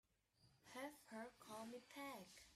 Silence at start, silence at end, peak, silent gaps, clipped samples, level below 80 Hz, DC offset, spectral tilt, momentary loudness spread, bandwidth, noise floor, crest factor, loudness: 0.4 s; 0 s; -42 dBFS; none; under 0.1%; -86 dBFS; under 0.1%; -3.5 dB/octave; 3 LU; 15.5 kHz; -79 dBFS; 16 dB; -56 LUFS